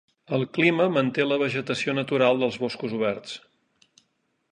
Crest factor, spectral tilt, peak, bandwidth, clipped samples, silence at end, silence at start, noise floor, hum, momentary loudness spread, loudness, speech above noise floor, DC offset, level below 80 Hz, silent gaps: 18 dB; -6 dB/octave; -6 dBFS; 10 kHz; under 0.1%; 1.15 s; 0.3 s; -73 dBFS; none; 9 LU; -24 LUFS; 49 dB; under 0.1%; -70 dBFS; none